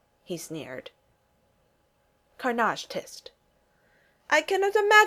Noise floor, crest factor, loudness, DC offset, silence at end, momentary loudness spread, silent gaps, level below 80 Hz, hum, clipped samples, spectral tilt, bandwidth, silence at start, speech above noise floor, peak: -68 dBFS; 24 dB; -27 LUFS; under 0.1%; 0 s; 20 LU; none; -72 dBFS; none; under 0.1%; -2.5 dB/octave; 16 kHz; 0.3 s; 44 dB; -4 dBFS